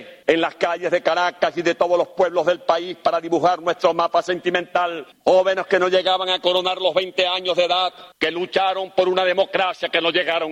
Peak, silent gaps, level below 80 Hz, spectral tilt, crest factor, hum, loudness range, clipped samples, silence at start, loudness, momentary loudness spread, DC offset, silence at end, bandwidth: -2 dBFS; none; -64 dBFS; -4 dB/octave; 18 dB; none; 1 LU; under 0.1%; 0 s; -20 LUFS; 4 LU; under 0.1%; 0 s; 9 kHz